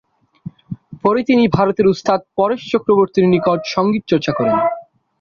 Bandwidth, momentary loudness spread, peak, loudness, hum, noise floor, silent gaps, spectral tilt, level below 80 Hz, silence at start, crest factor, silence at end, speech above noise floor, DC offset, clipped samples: 7.2 kHz; 18 LU; -2 dBFS; -16 LUFS; none; -36 dBFS; none; -7 dB/octave; -52 dBFS; 0.7 s; 14 dB; 0.4 s; 21 dB; under 0.1%; under 0.1%